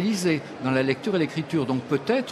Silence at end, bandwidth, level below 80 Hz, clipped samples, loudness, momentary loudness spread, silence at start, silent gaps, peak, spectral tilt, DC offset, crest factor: 0 s; 14 kHz; -64 dBFS; under 0.1%; -25 LUFS; 3 LU; 0 s; none; -8 dBFS; -6 dB/octave; under 0.1%; 16 dB